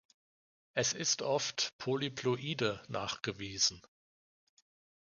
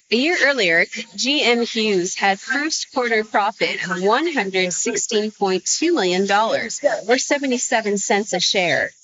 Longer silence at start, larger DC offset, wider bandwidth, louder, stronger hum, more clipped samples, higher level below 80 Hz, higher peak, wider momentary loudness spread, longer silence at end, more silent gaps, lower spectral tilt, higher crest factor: first, 0.75 s vs 0.1 s; neither; first, 10.5 kHz vs 8 kHz; second, -34 LUFS vs -19 LUFS; neither; neither; about the same, -70 dBFS vs -68 dBFS; second, -16 dBFS vs -2 dBFS; about the same, 7 LU vs 5 LU; first, 1.25 s vs 0.15 s; first, 1.73-1.79 s vs none; about the same, -2.5 dB/octave vs -1.5 dB/octave; about the same, 22 dB vs 18 dB